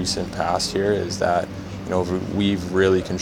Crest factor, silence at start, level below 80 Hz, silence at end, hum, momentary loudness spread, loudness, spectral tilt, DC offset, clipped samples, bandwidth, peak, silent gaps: 16 dB; 0 s; -44 dBFS; 0 s; none; 6 LU; -22 LUFS; -5 dB/octave; under 0.1%; under 0.1%; 16.5 kHz; -6 dBFS; none